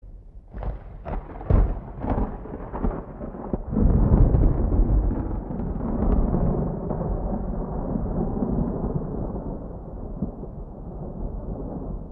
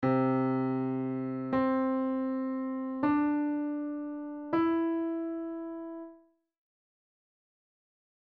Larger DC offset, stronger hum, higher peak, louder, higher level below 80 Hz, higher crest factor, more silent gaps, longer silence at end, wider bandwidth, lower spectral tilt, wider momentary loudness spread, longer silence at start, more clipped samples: neither; neither; first, -4 dBFS vs -18 dBFS; first, -27 LUFS vs -31 LUFS; first, -26 dBFS vs -68 dBFS; first, 20 dB vs 14 dB; neither; second, 0 s vs 2.1 s; second, 2.7 kHz vs 4.6 kHz; first, -13.5 dB/octave vs -7.5 dB/octave; first, 14 LU vs 11 LU; about the same, 0.05 s vs 0 s; neither